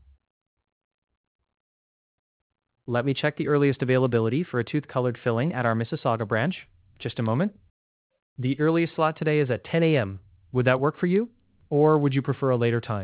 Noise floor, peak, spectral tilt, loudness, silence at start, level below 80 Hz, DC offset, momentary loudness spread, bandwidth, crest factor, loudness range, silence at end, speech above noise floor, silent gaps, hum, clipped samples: under -90 dBFS; -6 dBFS; -11.5 dB/octave; -25 LUFS; 2.9 s; -60 dBFS; under 0.1%; 8 LU; 4 kHz; 20 dB; 4 LU; 0 s; over 66 dB; 7.70-8.10 s, 8.22-8.36 s; none; under 0.1%